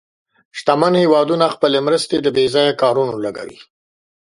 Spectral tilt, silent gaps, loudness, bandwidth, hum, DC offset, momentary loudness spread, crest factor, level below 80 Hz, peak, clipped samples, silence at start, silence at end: -5 dB/octave; none; -16 LUFS; 11.5 kHz; none; under 0.1%; 12 LU; 16 dB; -60 dBFS; 0 dBFS; under 0.1%; 0.55 s; 0.6 s